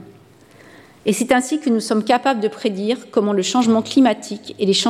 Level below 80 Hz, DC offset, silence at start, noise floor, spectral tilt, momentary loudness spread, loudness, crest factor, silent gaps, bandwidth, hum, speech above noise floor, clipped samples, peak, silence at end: -62 dBFS; under 0.1%; 0 s; -47 dBFS; -4 dB/octave; 7 LU; -18 LUFS; 16 dB; none; 14.5 kHz; none; 30 dB; under 0.1%; -4 dBFS; 0 s